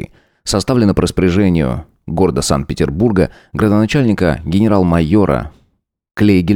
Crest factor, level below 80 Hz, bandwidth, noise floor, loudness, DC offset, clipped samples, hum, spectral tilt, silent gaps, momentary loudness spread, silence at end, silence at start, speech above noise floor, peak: 14 dB; -32 dBFS; 16.5 kHz; -61 dBFS; -14 LUFS; under 0.1%; under 0.1%; none; -6.5 dB/octave; 6.11-6.15 s; 8 LU; 0 s; 0 s; 48 dB; 0 dBFS